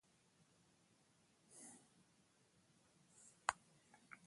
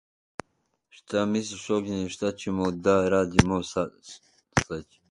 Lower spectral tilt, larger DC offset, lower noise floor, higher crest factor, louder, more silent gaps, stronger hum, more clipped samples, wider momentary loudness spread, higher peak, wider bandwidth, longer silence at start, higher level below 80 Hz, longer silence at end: second, -1 dB/octave vs -5.5 dB/octave; neither; about the same, -76 dBFS vs -74 dBFS; first, 40 dB vs 26 dB; second, -49 LUFS vs -26 LUFS; neither; neither; neither; about the same, 20 LU vs 21 LU; second, -18 dBFS vs -2 dBFS; about the same, 11.5 kHz vs 11.5 kHz; first, 1.5 s vs 1.1 s; second, -88 dBFS vs -46 dBFS; second, 0 s vs 0.3 s